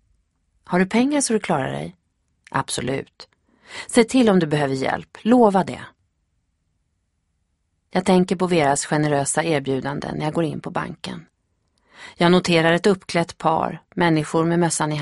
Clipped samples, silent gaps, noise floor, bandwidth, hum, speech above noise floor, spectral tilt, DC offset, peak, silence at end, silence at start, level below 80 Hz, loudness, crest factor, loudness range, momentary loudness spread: under 0.1%; none; -71 dBFS; 11.5 kHz; none; 51 dB; -5 dB/octave; under 0.1%; -2 dBFS; 0 s; 0.7 s; -54 dBFS; -20 LUFS; 20 dB; 4 LU; 13 LU